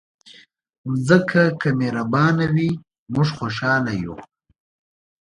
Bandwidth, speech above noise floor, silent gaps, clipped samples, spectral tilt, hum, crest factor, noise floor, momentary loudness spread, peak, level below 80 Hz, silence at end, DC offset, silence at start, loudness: 10.5 kHz; 30 dB; 0.78-0.84 s, 2.98-3.06 s; under 0.1%; -7 dB/octave; none; 20 dB; -49 dBFS; 13 LU; 0 dBFS; -54 dBFS; 0.95 s; under 0.1%; 0.25 s; -20 LUFS